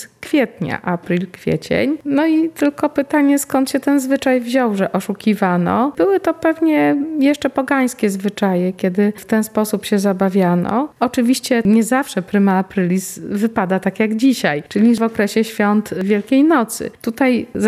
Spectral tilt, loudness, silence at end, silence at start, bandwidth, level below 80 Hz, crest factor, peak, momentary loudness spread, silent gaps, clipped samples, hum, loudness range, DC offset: -6 dB/octave; -17 LUFS; 0 s; 0 s; 15 kHz; -54 dBFS; 14 dB; -2 dBFS; 5 LU; none; under 0.1%; none; 1 LU; under 0.1%